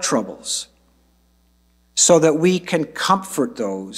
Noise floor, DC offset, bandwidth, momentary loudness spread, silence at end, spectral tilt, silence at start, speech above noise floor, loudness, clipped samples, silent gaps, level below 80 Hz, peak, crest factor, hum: -59 dBFS; under 0.1%; 16 kHz; 12 LU; 0 s; -3.5 dB/octave; 0 s; 40 dB; -18 LUFS; under 0.1%; none; -60 dBFS; -2 dBFS; 18 dB; none